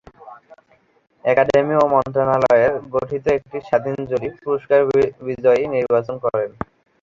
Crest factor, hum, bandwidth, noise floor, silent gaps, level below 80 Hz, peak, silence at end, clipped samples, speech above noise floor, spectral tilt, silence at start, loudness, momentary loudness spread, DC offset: 18 dB; none; 7.6 kHz; -56 dBFS; none; -52 dBFS; -2 dBFS; 0.55 s; under 0.1%; 38 dB; -7.5 dB/octave; 0.25 s; -19 LUFS; 9 LU; under 0.1%